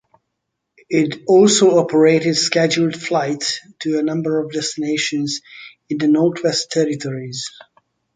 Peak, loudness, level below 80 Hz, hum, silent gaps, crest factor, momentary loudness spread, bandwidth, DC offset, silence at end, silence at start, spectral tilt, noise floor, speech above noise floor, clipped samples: -2 dBFS; -17 LUFS; -64 dBFS; none; none; 16 dB; 13 LU; 9.6 kHz; under 0.1%; 0.65 s; 0.9 s; -4 dB/octave; -76 dBFS; 59 dB; under 0.1%